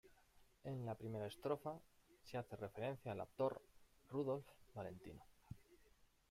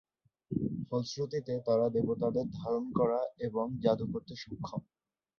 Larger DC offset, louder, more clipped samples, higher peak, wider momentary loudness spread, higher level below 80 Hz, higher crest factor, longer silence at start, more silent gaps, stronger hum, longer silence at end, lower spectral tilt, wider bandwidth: neither; second, -48 LUFS vs -34 LUFS; neither; second, -28 dBFS vs -14 dBFS; first, 17 LU vs 11 LU; second, -74 dBFS vs -62 dBFS; about the same, 20 dB vs 20 dB; second, 0.05 s vs 0.5 s; neither; neither; second, 0.25 s vs 0.55 s; about the same, -7.5 dB/octave vs -7.5 dB/octave; first, 16 kHz vs 7 kHz